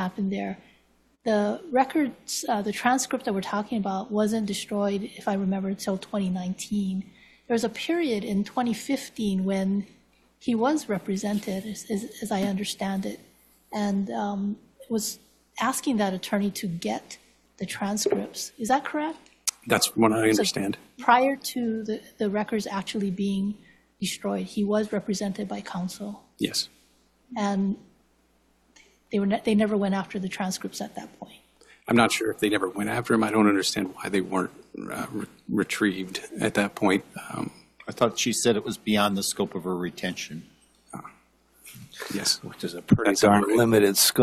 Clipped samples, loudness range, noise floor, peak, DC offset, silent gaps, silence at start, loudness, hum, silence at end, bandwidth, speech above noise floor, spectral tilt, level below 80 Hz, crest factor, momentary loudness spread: under 0.1%; 6 LU; -65 dBFS; -6 dBFS; under 0.1%; none; 0 s; -26 LUFS; none; 0 s; 14.5 kHz; 39 dB; -4.5 dB/octave; -60 dBFS; 20 dB; 14 LU